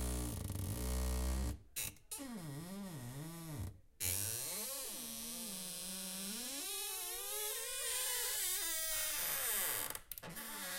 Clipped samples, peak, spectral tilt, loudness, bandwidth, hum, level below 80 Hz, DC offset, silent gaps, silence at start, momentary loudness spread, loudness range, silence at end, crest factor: under 0.1%; -22 dBFS; -2 dB/octave; -40 LUFS; 17 kHz; none; -50 dBFS; under 0.1%; none; 0 s; 12 LU; 6 LU; 0 s; 20 dB